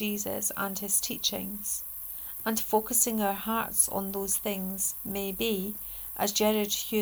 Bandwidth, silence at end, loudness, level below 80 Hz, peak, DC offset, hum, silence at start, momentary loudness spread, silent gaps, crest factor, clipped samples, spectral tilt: over 20 kHz; 0 s; -28 LUFS; -56 dBFS; -10 dBFS; under 0.1%; none; 0 s; 8 LU; none; 20 dB; under 0.1%; -2.5 dB/octave